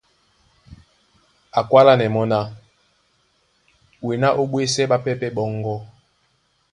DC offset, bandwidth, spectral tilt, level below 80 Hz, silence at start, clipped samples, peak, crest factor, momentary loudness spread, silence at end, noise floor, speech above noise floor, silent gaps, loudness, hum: under 0.1%; 11.5 kHz; -5.5 dB/octave; -58 dBFS; 0.7 s; under 0.1%; 0 dBFS; 22 dB; 15 LU; 0.85 s; -65 dBFS; 47 dB; none; -19 LUFS; none